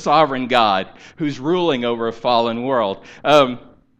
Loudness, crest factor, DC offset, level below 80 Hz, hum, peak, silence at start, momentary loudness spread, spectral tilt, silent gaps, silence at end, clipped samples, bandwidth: -18 LUFS; 18 dB; under 0.1%; -54 dBFS; none; 0 dBFS; 0 s; 10 LU; -5.5 dB/octave; none; 0.4 s; under 0.1%; 9.2 kHz